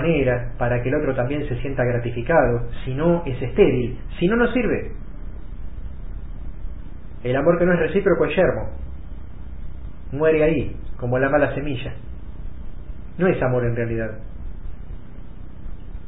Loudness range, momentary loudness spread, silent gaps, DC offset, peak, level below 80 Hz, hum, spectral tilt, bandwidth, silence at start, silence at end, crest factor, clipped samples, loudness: 5 LU; 21 LU; none; 3%; -4 dBFS; -34 dBFS; none; -12 dB/octave; 4 kHz; 0 s; 0 s; 20 dB; under 0.1%; -21 LUFS